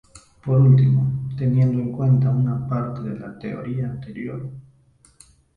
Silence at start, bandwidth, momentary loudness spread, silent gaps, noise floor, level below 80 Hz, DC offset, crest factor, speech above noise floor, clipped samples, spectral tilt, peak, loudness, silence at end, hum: 0.15 s; 9.4 kHz; 17 LU; none; -56 dBFS; -52 dBFS; under 0.1%; 16 dB; 37 dB; under 0.1%; -10 dB/octave; -4 dBFS; -21 LUFS; 0.95 s; none